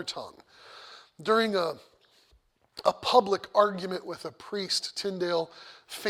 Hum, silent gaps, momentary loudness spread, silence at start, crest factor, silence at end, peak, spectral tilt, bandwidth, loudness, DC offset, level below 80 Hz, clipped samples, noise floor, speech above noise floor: none; none; 23 LU; 0 s; 24 dB; 0 s; -6 dBFS; -3.5 dB/octave; 16.5 kHz; -28 LUFS; under 0.1%; -72 dBFS; under 0.1%; -66 dBFS; 37 dB